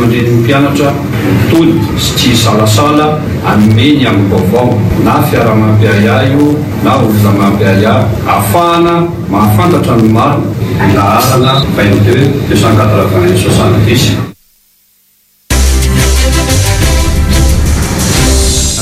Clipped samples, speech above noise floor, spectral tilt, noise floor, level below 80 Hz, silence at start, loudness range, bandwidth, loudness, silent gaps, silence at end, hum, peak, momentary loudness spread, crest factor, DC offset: 2%; 42 dB; -5.5 dB/octave; -50 dBFS; -18 dBFS; 0 s; 3 LU; 16 kHz; -8 LUFS; none; 0 s; none; 0 dBFS; 4 LU; 8 dB; under 0.1%